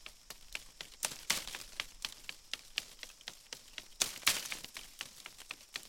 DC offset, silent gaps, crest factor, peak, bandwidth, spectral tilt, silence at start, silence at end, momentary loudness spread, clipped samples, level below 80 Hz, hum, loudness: under 0.1%; none; 34 dB; -8 dBFS; 17 kHz; 1 dB/octave; 0 s; 0 s; 17 LU; under 0.1%; -64 dBFS; none; -39 LUFS